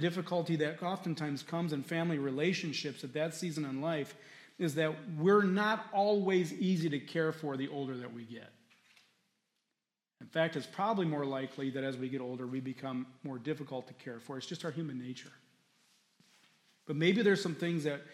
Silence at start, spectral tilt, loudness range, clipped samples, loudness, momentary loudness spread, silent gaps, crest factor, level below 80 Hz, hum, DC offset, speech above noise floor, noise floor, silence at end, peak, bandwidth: 0 s; -6 dB/octave; 10 LU; under 0.1%; -35 LUFS; 14 LU; none; 20 dB; -86 dBFS; none; under 0.1%; 54 dB; -89 dBFS; 0 s; -16 dBFS; 14 kHz